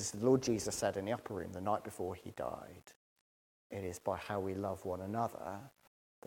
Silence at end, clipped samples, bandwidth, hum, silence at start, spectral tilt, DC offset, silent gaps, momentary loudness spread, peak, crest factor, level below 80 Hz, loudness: 0.6 s; under 0.1%; 17.5 kHz; none; 0 s; -5 dB/octave; under 0.1%; 2.96-3.70 s; 15 LU; -18 dBFS; 22 dB; -68 dBFS; -38 LUFS